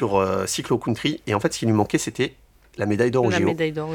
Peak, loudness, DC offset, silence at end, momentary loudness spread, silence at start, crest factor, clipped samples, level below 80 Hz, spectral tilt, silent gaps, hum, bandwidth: -4 dBFS; -22 LUFS; under 0.1%; 0 s; 7 LU; 0 s; 18 dB; under 0.1%; -54 dBFS; -5 dB/octave; none; none; 18 kHz